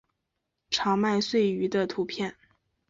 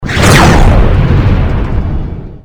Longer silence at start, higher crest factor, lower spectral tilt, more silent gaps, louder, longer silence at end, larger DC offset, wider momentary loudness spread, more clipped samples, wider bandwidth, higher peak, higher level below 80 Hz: first, 0.7 s vs 0 s; first, 16 dB vs 8 dB; about the same, -5 dB/octave vs -5.5 dB/octave; neither; second, -27 LUFS vs -8 LUFS; first, 0.55 s vs 0.1 s; neither; second, 8 LU vs 13 LU; second, under 0.1% vs 2%; second, 7.8 kHz vs over 20 kHz; second, -12 dBFS vs 0 dBFS; second, -66 dBFS vs -12 dBFS